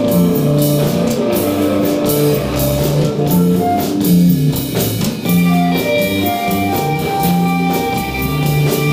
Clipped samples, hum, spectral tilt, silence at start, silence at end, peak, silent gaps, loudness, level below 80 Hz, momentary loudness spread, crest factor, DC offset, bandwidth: under 0.1%; none; -6 dB/octave; 0 s; 0 s; -2 dBFS; none; -14 LUFS; -36 dBFS; 4 LU; 12 dB; under 0.1%; 16 kHz